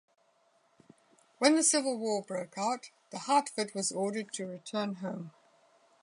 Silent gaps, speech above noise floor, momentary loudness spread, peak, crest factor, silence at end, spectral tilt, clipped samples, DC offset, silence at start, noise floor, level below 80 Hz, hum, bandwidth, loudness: none; 38 dB; 15 LU; -12 dBFS; 22 dB; 0.7 s; -3 dB/octave; under 0.1%; under 0.1%; 1.4 s; -70 dBFS; -86 dBFS; none; 11 kHz; -31 LUFS